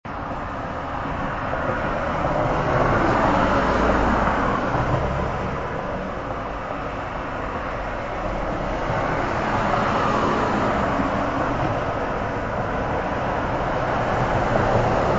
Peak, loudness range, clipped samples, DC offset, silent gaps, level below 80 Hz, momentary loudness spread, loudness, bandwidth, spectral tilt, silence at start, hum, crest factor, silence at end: -6 dBFS; 6 LU; under 0.1%; under 0.1%; none; -34 dBFS; 9 LU; -23 LUFS; 8 kHz; -7 dB/octave; 0.05 s; none; 16 dB; 0 s